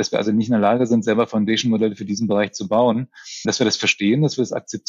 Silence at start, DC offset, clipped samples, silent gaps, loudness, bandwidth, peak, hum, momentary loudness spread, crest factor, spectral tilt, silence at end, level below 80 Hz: 0 s; under 0.1%; under 0.1%; none; -19 LUFS; 7.8 kHz; -4 dBFS; none; 7 LU; 14 dB; -5 dB/octave; 0.1 s; -66 dBFS